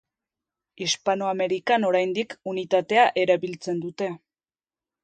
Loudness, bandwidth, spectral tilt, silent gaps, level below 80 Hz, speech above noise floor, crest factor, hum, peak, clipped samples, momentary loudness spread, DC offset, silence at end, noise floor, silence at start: -24 LUFS; 9.2 kHz; -4 dB/octave; none; -74 dBFS; over 66 dB; 20 dB; none; -6 dBFS; under 0.1%; 11 LU; under 0.1%; 0.85 s; under -90 dBFS; 0.8 s